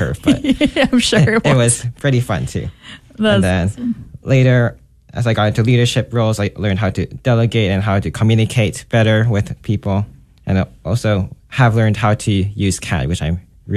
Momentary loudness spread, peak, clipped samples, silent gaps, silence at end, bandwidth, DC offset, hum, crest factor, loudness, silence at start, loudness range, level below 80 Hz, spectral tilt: 9 LU; 0 dBFS; under 0.1%; none; 0 s; 13 kHz; under 0.1%; none; 14 dB; -16 LUFS; 0 s; 2 LU; -36 dBFS; -5.5 dB/octave